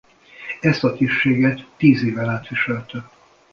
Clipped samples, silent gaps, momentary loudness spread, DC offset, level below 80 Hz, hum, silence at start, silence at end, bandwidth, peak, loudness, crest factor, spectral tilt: under 0.1%; none; 16 LU; under 0.1%; -54 dBFS; none; 0.4 s; 0.45 s; 7 kHz; -2 dBFS; -19 LUFS; 18 dB; -7.5 dB/octave